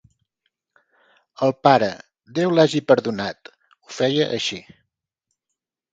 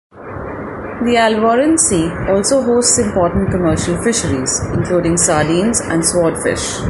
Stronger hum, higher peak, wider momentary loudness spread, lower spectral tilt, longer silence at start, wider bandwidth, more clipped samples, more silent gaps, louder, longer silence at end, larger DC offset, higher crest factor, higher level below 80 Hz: neither; about the same, 0 dBFS vs 0 dBFS; first, 19 LU vs 12 LU; first, -5.5 dB/octave vs -4 dB/octave; first, 1.4 s vs 0.15 s; second, 9.2 kHz vs 12 kHz; neither; neither; second, -20 LUFS vs -14 LUFS; first, 1.3 s vs 0 s; neither; first, 22 dB vs 14 dB; second, -64 dBFS vs -34 dBFS